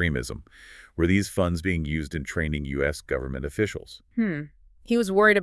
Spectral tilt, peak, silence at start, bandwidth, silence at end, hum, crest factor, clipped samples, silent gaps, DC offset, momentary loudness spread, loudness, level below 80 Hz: -6 dB/octave; -6 dBFS; 0 s; 12 kHz; 0 s; none; 20 dB; under 0.1%; none; under 0.1%; 14 LU; -26 LUFS; -42 dBFS